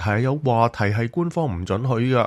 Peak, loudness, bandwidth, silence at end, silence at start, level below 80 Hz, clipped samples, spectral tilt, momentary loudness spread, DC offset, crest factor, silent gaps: -4 dBFS; -22 LUFS; 11.5 kHz; 0 s; 0 s; -48 dBFS; under 0.1%; -8 dB/octave; 5 LU; under 0.1%; 18 dB; none